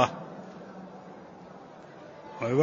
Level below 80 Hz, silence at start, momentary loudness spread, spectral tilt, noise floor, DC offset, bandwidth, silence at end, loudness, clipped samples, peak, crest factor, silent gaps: -70 dBFS; 0 s; 18 LU; -6 dB/octave; -48 dBFS; under 0.1%; 7.4 kHz; 0 s; -38 LUFS; under 0.1%; -6 dBFS; 26 dB; none